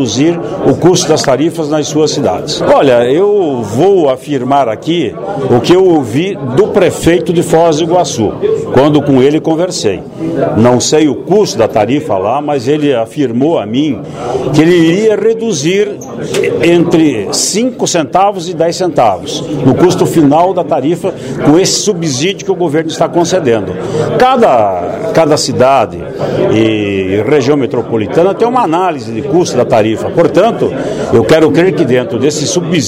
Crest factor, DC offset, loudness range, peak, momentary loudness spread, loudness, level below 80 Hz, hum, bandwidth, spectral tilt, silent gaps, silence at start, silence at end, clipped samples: 10 dB; under 0.1%; 1 LU; 0 dBFS; 7 LU; -10 LUFS; -42 dBFS; none; 16 kHz; -5 dB/octave; none; 0 s; 0 s; 0.6%